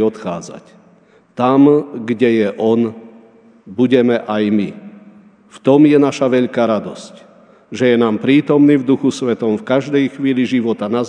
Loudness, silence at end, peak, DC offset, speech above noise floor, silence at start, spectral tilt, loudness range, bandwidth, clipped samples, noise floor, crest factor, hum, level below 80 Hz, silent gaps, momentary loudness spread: -14 LUFS; 0 s; 0 dBFS; under 0.1%; 35 dB; 0 s; -7 dB/octave; 2 LU; 9.8 kHz; under 0.1%; -49 dBFS; 16 dB; none; -66 dBFS; none; 14 LU